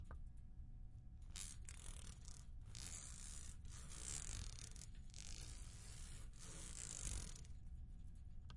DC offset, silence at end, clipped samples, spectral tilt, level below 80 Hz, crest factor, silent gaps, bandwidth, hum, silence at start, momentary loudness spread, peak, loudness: under 0.1%; 0 s; under 0.1%; -2.5 dB/octave; -56 dBFS; 22 dB; none; 11.5 kHz; none; 0 s; 11 LU; -30 dBFS; -54 LUFS